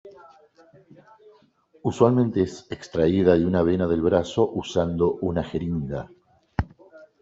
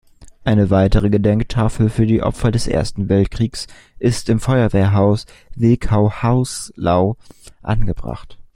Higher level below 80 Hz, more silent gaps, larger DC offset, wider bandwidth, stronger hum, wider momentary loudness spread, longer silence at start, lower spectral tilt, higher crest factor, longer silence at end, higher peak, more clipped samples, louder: second, -48 dBFS vs -28 dBFS; neither; neither; second, 8 kHz vs 12.5 kHz; neither; about the same, 13 LU vs 11 LU; second, 0.05 s vs 0.2 s; about the same, -7.5 dB/octave vs -7 dB/octave; about the same, 20 dB vs 16 dB; about the same, 0.15 s vs 0.15 s; about the same, -4 dBFS vs -2 dBFS; neither; second, -23 LUFS vs -17 LUFS